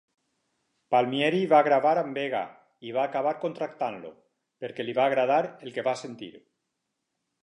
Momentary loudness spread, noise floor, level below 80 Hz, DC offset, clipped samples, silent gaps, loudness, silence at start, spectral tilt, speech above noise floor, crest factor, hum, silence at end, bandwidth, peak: 19 LU; -81 dBFS; -82 dBFS; under 0.1%; under 0.1%; none; -26 LUFS; 0.9 s; -6 dB/octave; 55 dB; 20 dB; none; 1.05 s; 10.5 kHz; -8 dBFS